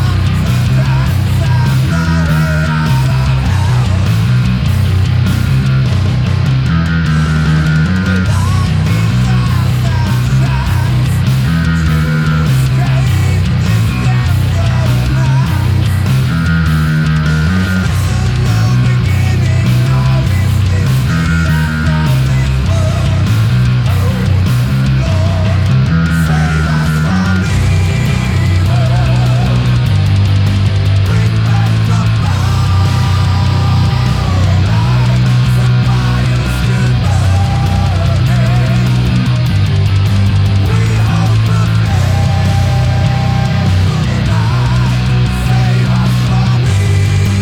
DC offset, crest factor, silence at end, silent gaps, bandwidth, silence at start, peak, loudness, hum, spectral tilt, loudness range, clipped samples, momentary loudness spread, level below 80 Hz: under 0.1%; 10 dB; 0 s; none; 16 kHz; 0 s; 0 dBFS; -12 LUFS; none; -6.5 dB/octave; 1 LU; under 0.1%; 2 LU; -22 dBFS